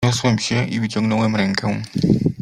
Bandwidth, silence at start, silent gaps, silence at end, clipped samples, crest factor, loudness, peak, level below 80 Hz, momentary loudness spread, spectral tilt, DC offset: 12 kHz; 0 s; none; 0 s; under 0.1%; 16 dB; -19 LUFS; -2 dBFS; -46 dBFS; 4 LU; -5.5 dB/octave; under 0.1%